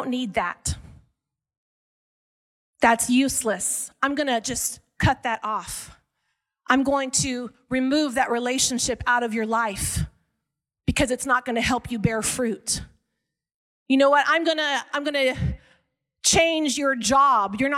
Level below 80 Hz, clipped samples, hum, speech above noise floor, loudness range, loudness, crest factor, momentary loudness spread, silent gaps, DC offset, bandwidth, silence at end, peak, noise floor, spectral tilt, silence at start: -44 dBFS; under 0.1%; none; 60 dB; 4 LU; -22 LUFS; 20 dB; 10 LU; 1.58-2.73 s, 13.54-13.86 s; under 0.1%; 16.5 kHz; 0 s; -4 dBFS; -83 dBFS; -3 dB/octave; 0 s